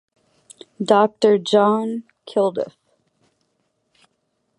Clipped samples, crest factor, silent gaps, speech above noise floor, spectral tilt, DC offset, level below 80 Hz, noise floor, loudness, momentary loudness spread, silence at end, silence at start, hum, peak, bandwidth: under 0.1%; 20 dB; none; 53 dB; -5.5 dB/octave; under 0.1%; -74 dBFS; -71 dBFS; -19 LUFS; 14 LU; 1.9 s; 0.8 s; none; -2 dBFS; 11 kHz